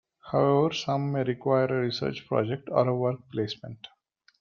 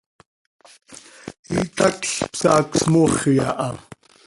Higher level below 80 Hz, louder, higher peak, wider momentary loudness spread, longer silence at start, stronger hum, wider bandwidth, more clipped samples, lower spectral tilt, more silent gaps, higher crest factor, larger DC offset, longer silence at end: second, -66 dBFS vs -50 dBFS; second, -27 LUFS vs -19 LUFS; second, -8 dBFS vs -2 dBFS; second, 9 LU vs 21 LU; second, 0.25 s vs 0.9 s; neither; second, 7.4 kHz vs 11.5 kHz; neither; first, -7 dB/octave vs -5 dB/octave; second, none vs 1.39-1.43 s; about the same, 20 dB vs 20 dB; neither; about the same, 0.55 s vs 0.45 s